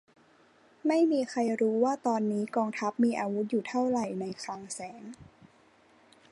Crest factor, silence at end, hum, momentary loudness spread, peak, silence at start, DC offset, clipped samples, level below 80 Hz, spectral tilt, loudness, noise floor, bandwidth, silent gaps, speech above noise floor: 16 dB; 1.1 s; none; 13 LU; -14 dBFS; 0.85 s; under 0.1%; under 0.1%; -74 dBFS; -5.5 dB/octave; -30 LUFS; -62 dBFS; 11.5 kHz; none; 33 dB